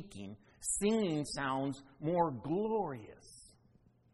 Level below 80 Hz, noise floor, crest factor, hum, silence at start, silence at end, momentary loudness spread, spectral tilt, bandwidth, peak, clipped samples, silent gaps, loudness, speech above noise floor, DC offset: -64 dBFS; -68 dBFS; 20 dB; none; 0 s; 0.65 s; 21 LU; -4.5 dB/octave; 11.5 kHz; -18 dBFS; under 0.1%; none; -35 LUFS; 31 dB; under 0.1%